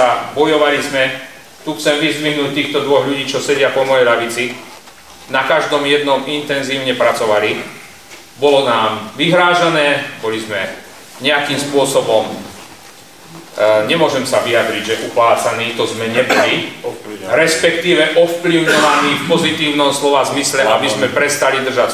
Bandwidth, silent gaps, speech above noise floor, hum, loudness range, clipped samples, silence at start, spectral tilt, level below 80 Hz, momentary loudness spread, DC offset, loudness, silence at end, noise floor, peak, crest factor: 16 kHz; none; 25 dB; none; 3 LU; under 0.1%; 0 s; -3.5 dB/octave; -56 dBFS; 11 LU; 0.4%; -14 LUFS; 0 s; -39 dBFS; 0 dBFS; 14 dB